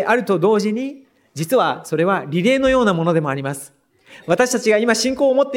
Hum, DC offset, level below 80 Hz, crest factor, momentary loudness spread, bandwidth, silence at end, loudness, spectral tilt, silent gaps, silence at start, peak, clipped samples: none; under 0.1%; -50 dBFS; 16 dB; 12 LU; 17 kHz; 0 s; -17 LUFS; -5 dB/octave; none; 0 s; -2 dBFS; under 0.1%